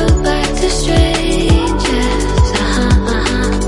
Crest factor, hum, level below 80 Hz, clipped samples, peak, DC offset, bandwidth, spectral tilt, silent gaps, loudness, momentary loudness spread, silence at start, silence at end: 12 dB; none; -16 dBFS; under 0.1%; 0 dBFS; under 0.1%; 11.5 kHz; -5 dB/octave; none; -14 LUFS; 2 LU; 0 s; 0 s